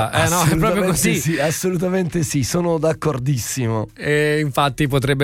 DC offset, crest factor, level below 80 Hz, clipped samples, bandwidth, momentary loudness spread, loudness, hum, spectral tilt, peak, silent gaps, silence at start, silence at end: under 0.1%; 16 dB; -40 dBFS; under 0.1%; 16.5 kHz; 5 LU; -19 LUFS; none; -5 dB/octave; -2 dBFS; none; 0 s; 0 s